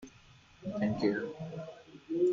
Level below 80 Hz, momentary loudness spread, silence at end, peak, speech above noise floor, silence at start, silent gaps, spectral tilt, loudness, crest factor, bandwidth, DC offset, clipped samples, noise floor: -66 dBFS; 18 LU; 0 s; -18 dBFS; 25 dB; 0 s; none; -7.5 dB/octave; -35 LUFS; 18 dB; 7.4 kHz; under 0.1%; under 0.1%; -59 dBFS